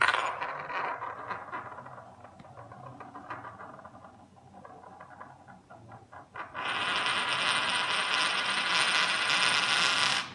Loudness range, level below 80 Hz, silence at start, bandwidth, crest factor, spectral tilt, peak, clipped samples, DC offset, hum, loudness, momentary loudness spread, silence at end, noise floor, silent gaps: 22 LU; -74 dBFS; 0 s; 12 kHz; 24 dB; -0.5 dB/octave; -8 dBFS; under 0.1%; under 0.1%; none; -27 LUFS; 25 LU; 0 s; -54 dBFS; none